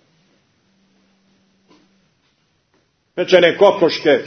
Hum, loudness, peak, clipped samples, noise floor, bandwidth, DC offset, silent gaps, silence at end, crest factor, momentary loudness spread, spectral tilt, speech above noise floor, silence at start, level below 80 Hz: none; -13 LUFS; 0 dBFS; under 0.1%; -63 dBFS; 6.4 kHz; under 0.1%; none; 0 s; 18 dB; 14 LU; -5 dB/octave; 50 dB; 3.15 s; -68 dBFS